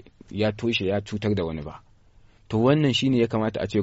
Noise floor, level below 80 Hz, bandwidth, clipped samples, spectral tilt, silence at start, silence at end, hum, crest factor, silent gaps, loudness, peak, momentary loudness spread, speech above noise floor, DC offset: -54 dBFS; -50 dBFS; 8 kHz; under 0.1%; -5 dB/octave; 0.3 s; 0 s; none; 18 dB; none; -24 LUFS; -8 dBFS; 11 LU; 31 dB; under 0.1%